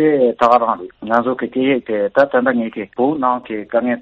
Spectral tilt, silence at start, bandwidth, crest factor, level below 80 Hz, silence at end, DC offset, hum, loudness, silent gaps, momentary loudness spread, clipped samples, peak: -7 dB/octave; 0 s; 7.4 kHz; 16 dB; -58 dBFS; 0 s; under 0.1%; none; -17 LUFS; none; 8 LU; under 0.1%; 0 dBFS